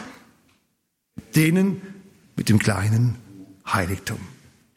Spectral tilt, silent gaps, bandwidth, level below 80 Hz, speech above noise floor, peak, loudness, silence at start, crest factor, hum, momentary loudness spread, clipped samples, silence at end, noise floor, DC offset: -6 dB/octave; none; 16.5 kHz; -56 dBFS; 53 dB; -6 dBFS; -22 LUFS; 0 s; 18 dB; none; 22 LU; under 0.1%; 0.45 s; -73 dBFS; under 0.1%